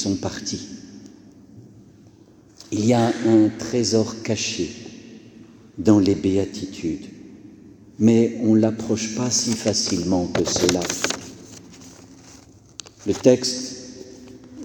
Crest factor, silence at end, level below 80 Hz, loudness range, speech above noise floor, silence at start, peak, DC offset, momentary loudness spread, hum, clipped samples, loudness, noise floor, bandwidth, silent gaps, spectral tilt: 20 dB; 0 s; -54 dBFS; 5 LU; 30 dB; 0 s; -2 dBFS; under 0.1%; 24 LU; none; under 0.1%; -21 LUFS; -50 dBFS; 19.5 kHz; none; -4.5 dB/octave